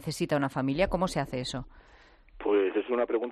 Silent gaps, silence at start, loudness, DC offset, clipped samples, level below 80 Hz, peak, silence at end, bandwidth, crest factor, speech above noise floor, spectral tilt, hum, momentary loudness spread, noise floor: none; 0 s; -29 LUFS; under 0.1%; under 0.1%; -48 dBFS; -14 dBFS; 0 s; 13.5 kHz; 16 dB; 22 dB; -6 dB/octave; none; 9 LU; -51 dBFS